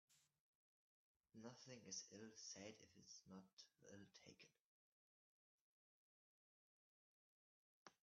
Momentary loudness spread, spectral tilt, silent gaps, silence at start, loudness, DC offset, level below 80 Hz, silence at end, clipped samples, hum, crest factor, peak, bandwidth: 12 LU; -3.5 dB/octave; 0.40-1.20 s, 3.53-3.57 s, 4.60-7.86 s; 0.1 s; -60 LUFS; under 0.1%; under -90 dBFS; 0.1 s; under 0.1%; none; 24 dB; -42 dBFS; 7.4 kHz